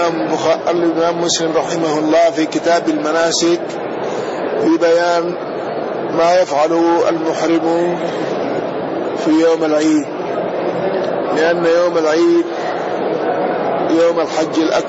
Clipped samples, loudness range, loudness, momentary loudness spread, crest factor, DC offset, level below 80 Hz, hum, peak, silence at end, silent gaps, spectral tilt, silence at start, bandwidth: under 0.1%; 2 LU; -15 LUFS; 8 LU; 10 dB; under 0.1%; -58 dBFS; none; -4 dBFS; 0 s; none; -4.5 dB/octave; 0 s; 8 kHz